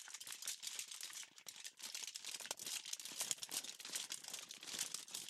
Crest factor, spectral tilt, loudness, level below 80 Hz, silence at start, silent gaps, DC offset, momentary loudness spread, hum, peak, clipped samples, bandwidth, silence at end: 30 dB; 2 dB/octave; -46 LUFS; under -90 dBFS; 0 s; none; under 0.1%; 7 LU; none; -18 dBFS; under 0.1%; 16 kHz; 0 s